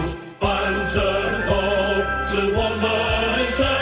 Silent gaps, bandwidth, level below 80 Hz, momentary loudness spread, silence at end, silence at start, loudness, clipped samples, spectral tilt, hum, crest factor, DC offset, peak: none; 4 kHz; -32 dBFS; 2 LU; 0 s; 0 s; -21 LUFS; under 0.1%; -9.5 dB/octave; none; 14 dB; under 0.1%; -8 dBFS